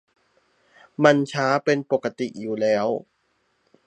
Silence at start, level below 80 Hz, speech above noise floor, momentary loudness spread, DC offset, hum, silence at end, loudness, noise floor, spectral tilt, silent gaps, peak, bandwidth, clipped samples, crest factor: 1 s; -72 dBFS; 48 dB; 12 LU; under 0.1%; none; 0.85 s; -22 LUFS; -69 dBFS; -5.5 dB/octave; none; 0 dBFS; 9.2 kHz; under 0.1%; 24 dB